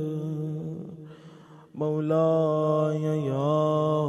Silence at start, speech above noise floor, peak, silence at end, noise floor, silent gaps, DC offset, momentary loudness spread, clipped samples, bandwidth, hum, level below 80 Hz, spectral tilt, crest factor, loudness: 0 s; 25 dB; -12 dBFS; 0 s; -49 dBFS; none; under 0.1%; 18 LU; under 0.1%; 8 kHz; none; -70 dBFS; -9 dB/octave; 14 dB; -26 LUFS